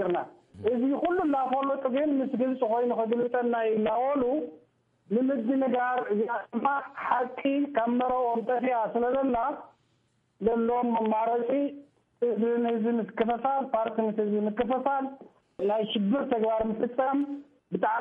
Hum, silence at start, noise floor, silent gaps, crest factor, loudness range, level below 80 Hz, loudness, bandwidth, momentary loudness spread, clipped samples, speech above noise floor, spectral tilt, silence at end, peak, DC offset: none; 0 s; -71 dBFS; none; 16 dB; 2 LU; -64 dBFS; -28 LUFS; 3.8 kHz; 5 LU; under 0.1%; 44 dB; -9 dB/octave; 0 s; -12 dBFS; under 0.1%